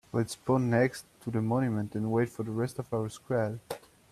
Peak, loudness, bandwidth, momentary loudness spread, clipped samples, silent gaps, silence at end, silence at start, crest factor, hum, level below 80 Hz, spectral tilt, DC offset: -12 dBFS; -31 LUFS; 14.5 kHz; 10 LU; under 0.1%; none; 0.35 s; 0.15 s; 18 dB; none; -64 dBFS; -7 dB/octave; under 0.1%